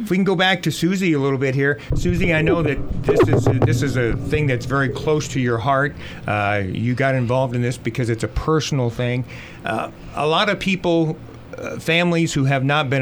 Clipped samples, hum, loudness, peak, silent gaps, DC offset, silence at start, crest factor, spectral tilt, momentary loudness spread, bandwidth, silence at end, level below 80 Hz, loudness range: under 0.1%; none; -19 LUFS; -4 dBFS; none; under 0.1%; 0 s; 16 dB; -6 dB/octave; 8 LU; 20 kHz; 0 s; -36 dBFS; 3 LU